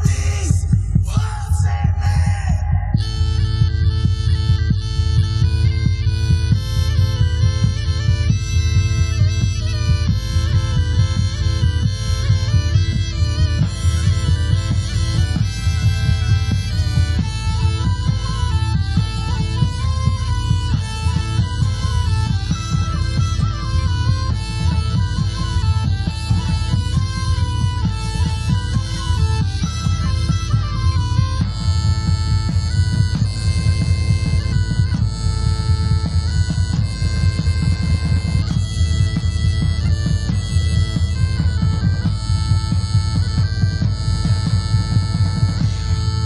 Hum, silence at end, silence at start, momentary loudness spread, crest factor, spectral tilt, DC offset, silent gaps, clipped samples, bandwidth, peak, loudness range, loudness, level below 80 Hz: none; 0 s; 0 s; 3 LU; 14 dB; -5.5 dB/octave; under 0.1%; none; under 0.1%; 11.5 kHz; -2 dBFS; 2 LU; -19 LUFS; -22 dBFS